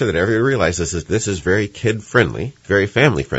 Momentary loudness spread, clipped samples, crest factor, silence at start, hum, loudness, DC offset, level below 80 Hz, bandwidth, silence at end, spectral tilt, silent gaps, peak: 5 LU; under 0.1%; 18 dB; 0 s; none; -17 LUFS; under 0.1%; -42 dBFS; 8.2 kHz; 0 s; -5 dB/octave; none; 0 dBFS